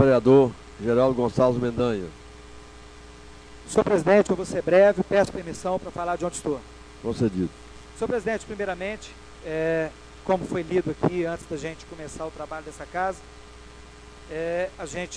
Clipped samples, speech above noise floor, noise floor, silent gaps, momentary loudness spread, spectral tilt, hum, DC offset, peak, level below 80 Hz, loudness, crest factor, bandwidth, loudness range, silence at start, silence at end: under 0.1%; 21 dB; -45 dBFS; none; 21 LU; -6 dB/octave; none; under 0.1%; -4 dBFS; -48 dBFS; -25 LUFS; 22 dB; 11 kHz; 9 LU; 0 s; 0 s